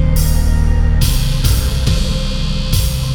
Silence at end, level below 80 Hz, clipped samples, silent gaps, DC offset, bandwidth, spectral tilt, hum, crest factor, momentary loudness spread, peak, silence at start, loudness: 0 s; -14 dBFS; under 0.1%; none; under 0.1%; 18.5 kHz; -5 dB/octave; none; 12 dB; 4 LU; 0 dBFS; 0 s; -16 LUFS